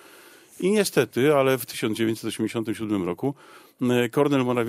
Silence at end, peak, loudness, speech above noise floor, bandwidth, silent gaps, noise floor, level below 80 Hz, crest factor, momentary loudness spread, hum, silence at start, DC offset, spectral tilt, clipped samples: 0 s; -8 dBFS; -24 LUFS; 26 dB; 16 kHz; none; -50 dBFS; -68 dBFS; 16 dB; 8 LU; none; 0.6 s; under 0.1%; -5.5 dB/octave; under 0.1%